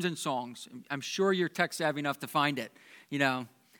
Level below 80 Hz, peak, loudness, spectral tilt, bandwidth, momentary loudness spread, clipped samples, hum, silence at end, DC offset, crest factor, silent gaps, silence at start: -90 dBFS; -10 dBFS; -31 LUFS; -4.5 dB/octave; 19 kHz; 10 LU; under 0.1%; none; 0.35 s; under 0.1%; 22 dB; none; 0 s